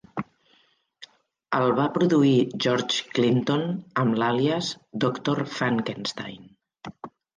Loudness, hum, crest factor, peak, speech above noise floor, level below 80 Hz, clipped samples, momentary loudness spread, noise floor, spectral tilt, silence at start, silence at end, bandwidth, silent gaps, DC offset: -24 LUFS; none; 16 dB; -10 dBFS; 41 dB; -66 dBFS; under 0.1%; 18 LU; -64 dBFS; -5.5 dB/octave; 0.15 s; 0.3 s; 9.8 kHz; none; under 0.1%